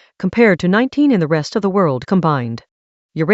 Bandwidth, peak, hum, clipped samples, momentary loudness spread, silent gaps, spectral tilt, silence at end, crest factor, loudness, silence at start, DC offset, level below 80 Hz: 8 kHz; 0 dBFS; none; under 0.1%; 10 LU; 2.71-3.09 s; -7.5 dB/octave; 0 s; 16 dB; -15 LUFS; 0.2 s; under 0.1%; -54 dBFS